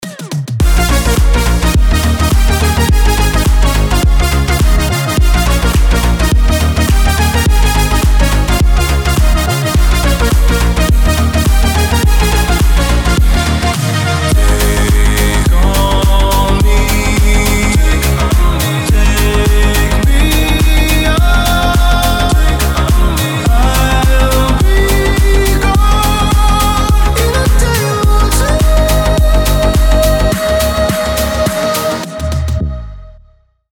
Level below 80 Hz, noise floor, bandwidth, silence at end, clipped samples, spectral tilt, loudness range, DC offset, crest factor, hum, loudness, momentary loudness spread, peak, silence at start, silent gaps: -12 dBFS; -47 dBFS; 18.5 kHz; 0.6 s; under 0.1%; -5 dB/octave; 1 LU; under 0.1%; 10 dB; none; -11 LUFS; 2 LU; 0 dBFS; 0 s; none